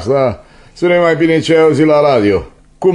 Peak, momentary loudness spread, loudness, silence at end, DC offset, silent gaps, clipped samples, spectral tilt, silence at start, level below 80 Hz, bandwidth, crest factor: 0 dBFS; 8 LU; -11 LUFS; 0 s; under 0.1%; none; under 0.1%; -6.5 dB/octave; 0 s; -42 dBFS; 10.5 kHz; 12 dB